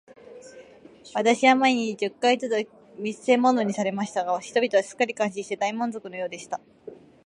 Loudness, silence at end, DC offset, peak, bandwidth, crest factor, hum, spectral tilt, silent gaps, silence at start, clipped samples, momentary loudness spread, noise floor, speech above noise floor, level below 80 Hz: -24 LUFS; 0.35 s; under 0.1%; -4 dBFS; 11 kHz; 20 dB; none; -4 dB/octave; none; 0.3 s; under 0.1%; 14 LU; -49 dBFS; 25 dB; -74 dBFS